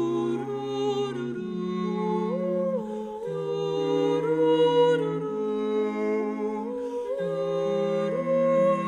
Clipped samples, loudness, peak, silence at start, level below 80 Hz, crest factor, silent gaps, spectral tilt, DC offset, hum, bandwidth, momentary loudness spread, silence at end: under 0.1%; -27 LUFS; -12 dBFS; 0 s; -66 dBFS; 14 dB; none; -7 dB/octave; under 0.1%; none; 9.8 kHz; 10 LU; 0 s